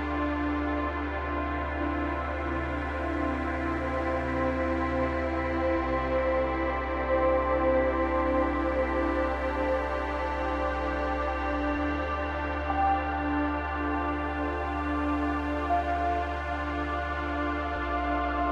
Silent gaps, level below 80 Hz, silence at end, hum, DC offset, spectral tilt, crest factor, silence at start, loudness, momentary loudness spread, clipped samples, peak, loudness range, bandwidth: none; -36 dBFS; 0 s; none; under 0.1%; -8 dB/octave; 14 dB; 0 s; -29 LUFS; 5 LU; under 0.1%; -14 dBFS; 3 LU; 8 kHz